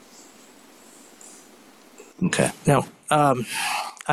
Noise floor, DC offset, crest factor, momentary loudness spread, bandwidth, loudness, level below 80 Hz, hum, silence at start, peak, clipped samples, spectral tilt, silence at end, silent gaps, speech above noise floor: -50 dBFS; under 0.1%; 20 dB; 25 LU; 14.5 kHz; -23 LUFS; -56 dBFS; none; 0.2 s; -6 dBFS; under 0.1%; -4.5 dB/octave; 0 s; none; 29 dB